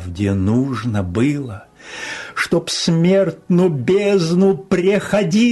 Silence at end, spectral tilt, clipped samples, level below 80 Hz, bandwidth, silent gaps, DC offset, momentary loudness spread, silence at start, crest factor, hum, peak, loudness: 0 s; -6 dB/octave; under 0.1%; -48 dBFS; 12.5 kHz; none; under 0.1%; 12 LU; 0 s; 12 dB; none; -6 dBFS; -17 LUFS